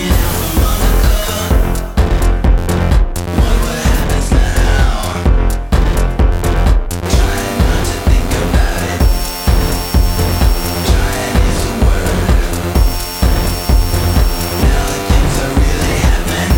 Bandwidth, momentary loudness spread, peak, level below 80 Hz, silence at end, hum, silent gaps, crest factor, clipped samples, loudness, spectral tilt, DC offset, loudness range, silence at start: 17 kHz; 2 LU; 0 dBFS; -14 dBFS; 0 s; none; none; 10 dB; under 0.1%; -14 LUFS; -5 dB/octave; under 0.1%; 1 LU; 0 s